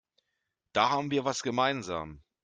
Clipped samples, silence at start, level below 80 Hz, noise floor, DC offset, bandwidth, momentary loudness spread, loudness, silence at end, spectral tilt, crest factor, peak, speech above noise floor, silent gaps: under 0.1%; 0.75 s; -64 dBFS; -83 dBFS; under 0.1%; 9.6 kHz; 10 LU; -30 LUFS; 0.25 s; -4 dB/octave; 22 dB; -10 dBFS; 54 dB; none